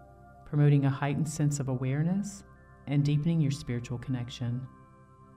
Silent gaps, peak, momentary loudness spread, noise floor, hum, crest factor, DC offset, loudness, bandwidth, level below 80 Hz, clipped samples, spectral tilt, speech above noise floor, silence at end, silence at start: none; -14 dBFS; 13 LU; -55 dBFS; none; 16 dB; under 0.1%; -30 LUFS; 11.5 kHz; -56 dBFS; under 0.1%; -7 dB/octave; 27 dB; 0.65 s; 0 s